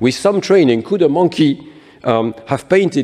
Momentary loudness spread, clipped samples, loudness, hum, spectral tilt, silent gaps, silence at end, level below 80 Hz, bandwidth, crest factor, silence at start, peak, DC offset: 9 LU; under 0.1%; -15 LUFS; none; -6 dB/octave; none; 0 s; -54 dBFS; 12 kHz; 14 dB; 0 s; -2 dBFS; under 0.1%